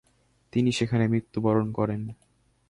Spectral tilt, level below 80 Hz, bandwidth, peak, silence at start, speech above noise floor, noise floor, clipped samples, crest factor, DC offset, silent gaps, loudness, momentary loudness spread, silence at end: -7 dB/octave; -56 dBFS; 11.5 kHz; -10 dBFS; 0.55 s; 41 dB; -66 dBFS; under 0.1%; 16 dB; under 0.1%; none; -26 LUFS; 8 LU; 0.55 s